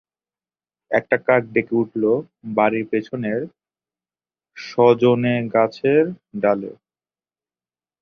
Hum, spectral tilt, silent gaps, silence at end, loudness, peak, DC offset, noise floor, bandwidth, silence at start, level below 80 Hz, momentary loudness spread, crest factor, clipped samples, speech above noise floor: none; -8 dB/octave; none; 1.3 s; -20 LUFS; -2 dBFS; under 0.1%; under -90 dBFS; 6.6 kHz; 0.9 s; -64 dBFS; 9 LU; 20 dB; under 0.1%; over 71 dB